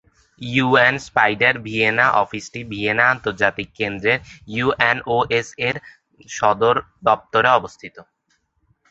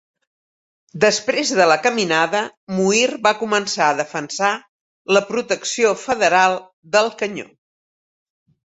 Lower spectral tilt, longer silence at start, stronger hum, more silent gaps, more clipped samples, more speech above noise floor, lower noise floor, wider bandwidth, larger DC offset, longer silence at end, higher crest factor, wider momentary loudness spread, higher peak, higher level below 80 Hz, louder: first, -4.5 dB/octave vs -3 dB/octave; second, 0.4 s vs 0.95 s; neither; second, none vs 2.57-2.67 s, 4.69-5.05 s, 6.73-6.83 s; neither; second, 48 dB vs over 72 dB; second, -67 dBFS vs under -90 dBFS; about the same, 8 kHz vs 8.4 kHz; neither; second, 0.9 s vs 1.3 s; about the same, 18 dB vs 18 dB; first, 14 LU vs 11 LU; about the same, -2 dBFS vs -2 dBFS; first, -52 dBFS vs -64 dBFS; about the same, -18 LUFS vs -18 LUFS